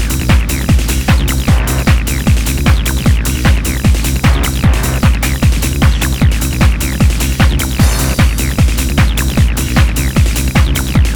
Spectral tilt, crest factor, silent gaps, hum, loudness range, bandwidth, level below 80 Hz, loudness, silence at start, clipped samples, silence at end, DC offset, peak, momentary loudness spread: -5 dB/octave; 10 dB; none; none; 0 LU; over 20 kHz; -14 dBFS; -12 LUFS; 0 s; under 0.1%; 0 s; under 0.1%; 0 dBFS; 1 LU